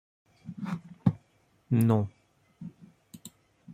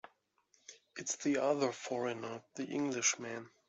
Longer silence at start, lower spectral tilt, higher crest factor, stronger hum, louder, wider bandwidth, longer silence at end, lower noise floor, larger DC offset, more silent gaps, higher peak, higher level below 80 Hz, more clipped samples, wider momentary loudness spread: second, 0.45 s vs 0.7 s; first, -8.5 dB/octave vs -3 dB/octave; about the same, 22 dB vs 20 dB; neither; first, -29 LUFS vs -36 LUFS; first, 15.5 kHz vs 8.2 kHz; second, 0 s vs 0.2 s; second, -67 dBFS vs -74 dBFS; neither; neither; first, -10 dBFS vs -18 dBFS; first, -68 dBFS vs -84 dBFS; neither; first, 24 LU vs 14 LU